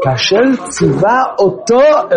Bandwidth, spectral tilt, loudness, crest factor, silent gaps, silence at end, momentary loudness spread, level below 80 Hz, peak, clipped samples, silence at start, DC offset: 10 kHz; -5 dB/octave; -11 LUFS; 10 dB; none; 0 s; 5 LU; -46 dBFS; 0 dBFS; under 0.1%; 0 s; under 0.1%